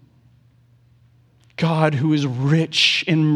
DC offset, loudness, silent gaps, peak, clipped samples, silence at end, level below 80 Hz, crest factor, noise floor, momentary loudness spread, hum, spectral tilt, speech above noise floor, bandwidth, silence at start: under 0.1%; -18 LUFS; none; -2 dBFS; under 0.1%; 0 s; -62 dBFS; 18 dB; -55 dBFS; 7 LU; none; -5.5 dB/octave; 37 dB; 10 kHz; 1.6 s